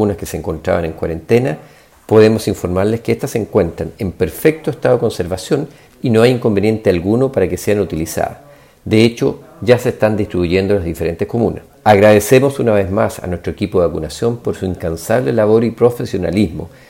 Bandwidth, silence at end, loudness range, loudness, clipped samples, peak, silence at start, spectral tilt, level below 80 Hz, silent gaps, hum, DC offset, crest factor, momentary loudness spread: 16.5 kHz; 0.2 s; 3 LU; -15 LUFS; under 0.1%; 0 dBFS; 0 s; -6.5 dB/octave; -40 dBFS; none; none; under 0.1%; 14 dB; 10 LU